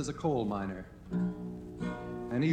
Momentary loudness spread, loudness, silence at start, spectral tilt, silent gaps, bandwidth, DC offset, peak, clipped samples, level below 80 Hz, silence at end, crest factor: 10 LU; -36 LUFS; 0 s; -7 dB/octave; none; 9.8 kHz; under 0.1%; -18 dBFS; under 0.1%; -54 dBFS; 0 s; 16 dB